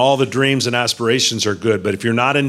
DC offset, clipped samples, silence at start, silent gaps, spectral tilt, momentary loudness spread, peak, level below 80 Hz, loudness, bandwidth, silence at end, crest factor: under 0.1%; under 0.1%; 0 s; none; -4 dB/octave; 3 LU; -2 dBFS; -60 dBFS; -16 LUFS; 15 kHz; 0 s; 14 dB